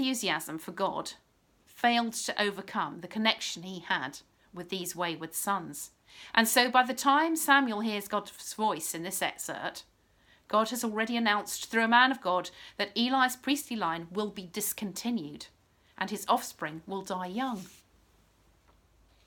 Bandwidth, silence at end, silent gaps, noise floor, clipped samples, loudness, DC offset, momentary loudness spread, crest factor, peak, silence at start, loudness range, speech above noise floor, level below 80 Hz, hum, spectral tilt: 19 kHz; 1.55 s; none; -65 dBFS; under 0.1%; -30 LUFS; under 0.1%; 15 LU; 24 dB; -6 dBFS; 0 s; 8 LU; 35 dB; -70 dBFS; none; -2.5 dB/octave